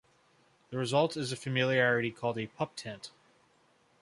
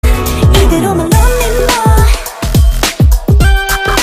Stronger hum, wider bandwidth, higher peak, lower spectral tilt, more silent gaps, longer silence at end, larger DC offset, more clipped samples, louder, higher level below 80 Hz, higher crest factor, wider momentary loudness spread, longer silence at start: neither; second, 11.5 kHz vs 16 kHz; second, -14 dBFS vs 0 dBFS; about the same, -5 dB/octave vs -5 dB/octave; neither; first, 0.95 s vs 0 s; neither; second, under 0.1% vs 0.2%; second, -31 LUFS vs -10 LUFS; second, -72 dBFS vs -10 dBFS; first, 20 dB vs 8 dB; first, 16 LU vs 3 LU; first, 0.7 s vs 0.05 s